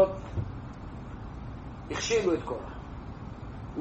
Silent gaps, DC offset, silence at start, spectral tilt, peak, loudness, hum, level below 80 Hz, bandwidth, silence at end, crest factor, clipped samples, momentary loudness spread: none; under 0.1%; 0 s; -5 dB/octave; -12 dBFS; -34 LUFS; none; -46 dBFS; 8.2 kHz; 0 s; 22 dB; under 0.1%; 15 LU